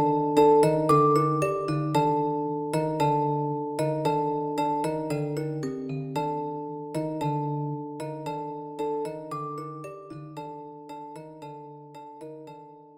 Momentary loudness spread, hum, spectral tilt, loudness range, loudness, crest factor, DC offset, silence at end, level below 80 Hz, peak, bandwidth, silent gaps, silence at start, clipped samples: 21 LU; none; -7.5 dB/octave; 14 LU; -27 LUFS; 18 dB; under 0.1%; 0.1 s; -62 dBFS; -8 dBFS; 16.5 kHz; none; 0 s; under 0.1%